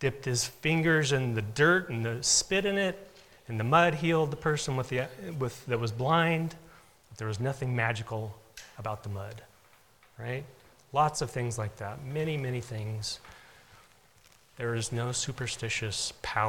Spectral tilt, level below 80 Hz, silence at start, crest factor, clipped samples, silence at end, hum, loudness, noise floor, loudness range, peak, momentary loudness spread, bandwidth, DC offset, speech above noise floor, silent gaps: -4 dB/octave; -58 dBFS; 0 s; 22 dB; under 0.1%; 0 s; none; -30 LUFS; -61 dBFS; 9 LU; -8 dBFS; 15 LU; 18 kHz; under 0.1%; 32 dB; none